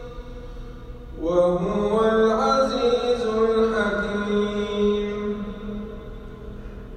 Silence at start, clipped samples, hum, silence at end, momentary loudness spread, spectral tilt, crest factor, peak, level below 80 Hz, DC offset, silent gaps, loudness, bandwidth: 0 s; under 0.1%; none; 0 s; 20 LU; -6 dB/octave; 14 dB; -8 dBFS; -40 dBFS; under 0.1%; none; -22 LUFS; 9.2 kHz